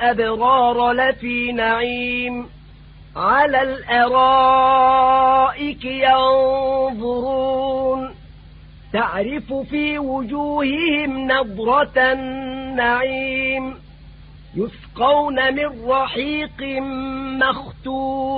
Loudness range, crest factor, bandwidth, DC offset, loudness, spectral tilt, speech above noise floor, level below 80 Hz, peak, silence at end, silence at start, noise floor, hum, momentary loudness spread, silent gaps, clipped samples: 7 LU; 16 dB; 4.9 kHz; under 0.1%; -18 LUFS; -9.5 dB/octave; 24 dB; -44 dBFS; -4 dBFS; 0 s; 0 s; -42 dBFS; none; 12 LU; none; under 0.1%